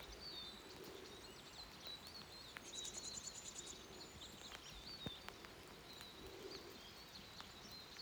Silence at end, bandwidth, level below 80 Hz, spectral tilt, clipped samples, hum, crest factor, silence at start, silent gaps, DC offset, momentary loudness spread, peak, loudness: 0 s; over 20 kHz; -70 dBFS; -2 dB/octave; under 0.1%; none; 24 dB; 0 s; none; under 0.1%; 7 LU; -30 dBFS; -53 LUFS